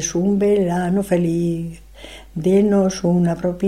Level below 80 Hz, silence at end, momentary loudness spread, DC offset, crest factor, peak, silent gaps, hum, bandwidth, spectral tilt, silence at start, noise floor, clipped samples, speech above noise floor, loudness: -44 dBFS; 0 s; 16 LU; 0.2%; 14 dB; -4 dBFS; none; none; 13 kHz; -6.5 dB/octave; 0 s; -39 dBFS; under 0.1%; 22 dB; -18 LUFS